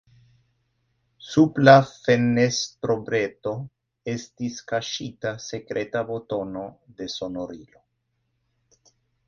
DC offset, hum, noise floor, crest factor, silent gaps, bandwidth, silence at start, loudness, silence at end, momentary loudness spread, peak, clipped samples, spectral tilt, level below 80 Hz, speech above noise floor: under 0.1%; none; -74 dBFS; 24 dB; none; 7.6 kHz; 1.25 s; -23 LUFS; 1.65 s; 19 LU; 0 dBFS; under 0.1%; -5.5 dB/octave; -60 dBFS; 51 dB